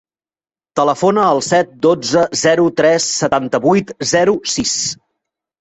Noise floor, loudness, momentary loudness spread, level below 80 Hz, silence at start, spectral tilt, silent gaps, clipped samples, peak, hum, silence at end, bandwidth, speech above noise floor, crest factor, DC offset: under -90 dBFS; -14 LUFS; 4 LU; -52 dBFS; 0.75 s; -3.5 dB/octave; none; under 0.1%; 0 dBFS; none; 0.65 s; 8.4 kHz; over 76 dB; 14 dB; under 0.1%